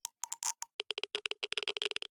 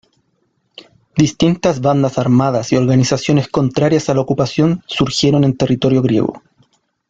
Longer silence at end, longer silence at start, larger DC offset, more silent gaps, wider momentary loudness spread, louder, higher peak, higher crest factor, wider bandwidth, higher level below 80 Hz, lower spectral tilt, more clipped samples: second, 0.25 s vs 0.7 s; second, 0.05 s vs 1.15 s; neither; first, 0.73-0.79 s vs none; about the same, 5 LU vs 4 LU; second, -37 LUFS vs -15 LUFS; second, -18 dBFS vs 0 dBFS; first, 22 dB vs 14 dB; first, 19.5 kHz vs 7.8 kHz; second, -86 dBFS vs -46 dBFS; second, 2 dB/octave vs -6.5 dB/octave; neither